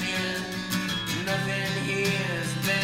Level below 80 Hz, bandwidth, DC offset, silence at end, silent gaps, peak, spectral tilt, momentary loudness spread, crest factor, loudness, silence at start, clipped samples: -56 dBFS; 16 kHz; under 0.1%; 0 s; none; -10 dBFS; -4 dB/octave; 4 LU; 16 dB; -27 LUFS; 0 s; under 0.1%